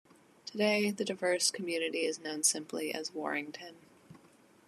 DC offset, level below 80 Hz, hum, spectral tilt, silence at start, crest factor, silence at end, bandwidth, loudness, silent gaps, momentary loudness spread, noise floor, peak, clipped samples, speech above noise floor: under 0.1%; -88 dBFS; none; -2 dB/octave; 0.45 s; 20 dB; 0.5 s; 13 kHz; -32 LUFS; none; 15 LU; -62 dBFS; -14 dBFS; under 0.1%; 29 dB